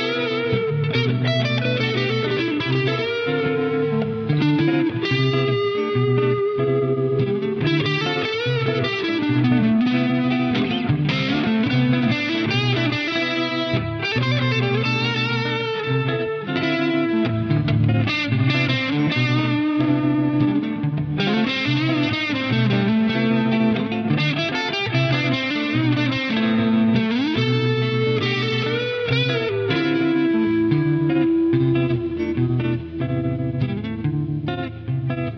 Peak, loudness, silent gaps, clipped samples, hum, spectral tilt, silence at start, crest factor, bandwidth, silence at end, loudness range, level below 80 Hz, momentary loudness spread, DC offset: -6 dBFS; -20 LUFS; none; under 0.1%; none; -7.5 dB/octave; 0 s; 14 dB; 6.6 kHz; 0 s; 1 LU; -50 dBFS; 4 LU; under 0.1%